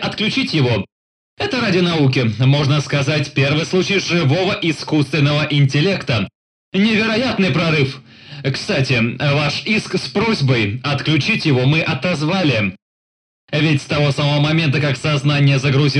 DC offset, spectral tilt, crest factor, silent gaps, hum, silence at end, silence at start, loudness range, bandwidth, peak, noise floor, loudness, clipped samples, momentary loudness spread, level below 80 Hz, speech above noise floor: under 0.1%; -6 dB/octave; 12 dB; 0.92-1.37 s, 6.35-6.72 s, 12.82-13.48 s; none; 0 s; 0 s; 2 LU; 10 kHz; -4 dBFS; under -90 dBFS; -16 LUFS; under 0.1%; 6 LU; -50 dBFS; over 74 dB